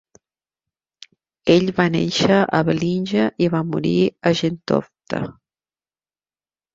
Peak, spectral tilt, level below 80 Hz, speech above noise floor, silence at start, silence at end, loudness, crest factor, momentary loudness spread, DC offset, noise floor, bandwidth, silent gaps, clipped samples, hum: 0 dBFS; -6 dB/octave; -54 dBFS; over 72 dB; 1.45 s; 1.45 s; -19 LUFS; 20 dB; 11 LU; under 0.1%; under -90 dBFS; 7.8 kHz; none; under 0.1%; none